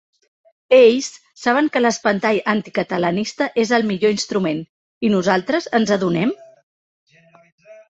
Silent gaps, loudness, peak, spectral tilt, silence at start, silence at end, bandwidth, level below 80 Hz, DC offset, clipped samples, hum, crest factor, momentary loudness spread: 4.69-5.01 s, 6.63-7.07 s, 7.52-7.58 s; -18 LUFS; -2 dBFS; -5 dB/octave; 0.7 s; 0.2 s; 8.2 kHz; -62 dBFS; under 0.1%; under 0.1%; none; 18 dB; 9 LU